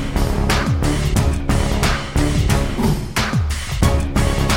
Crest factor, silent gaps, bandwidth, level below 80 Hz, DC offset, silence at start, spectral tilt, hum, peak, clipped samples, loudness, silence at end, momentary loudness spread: 16 dB; none; 17 kHz; -22 dBFS; under 0.1%; 0 s; -5 dB/octave; none; -2 dBFS; under 0.1%; -19 LUFS; 0 s; 2 LU